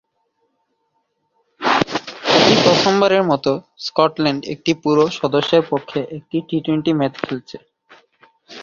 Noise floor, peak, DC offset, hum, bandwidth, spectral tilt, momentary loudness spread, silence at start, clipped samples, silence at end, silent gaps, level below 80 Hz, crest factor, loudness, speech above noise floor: -69 dBFS; 0 dBFS; under 0.1%; none; 7.4 kHz; -5 dB/octave; 13 LU; 1.6 s; under 0.1%; 0 s; none; -56 dBFS; 18 dB; -17 LUFS; 51 dB